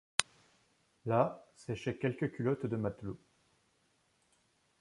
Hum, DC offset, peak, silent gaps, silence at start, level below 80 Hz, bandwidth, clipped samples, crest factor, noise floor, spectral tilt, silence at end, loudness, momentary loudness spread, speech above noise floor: none; under 0.1%; 0 dBFS; none; 0.2 s; -68 dBFS; 11.5 kHz; under 0.1%; 38 dB; -74 dBFS; -4.5 dB/octave; 1.65 s; -36 LUFS; 15 LU; 39 dB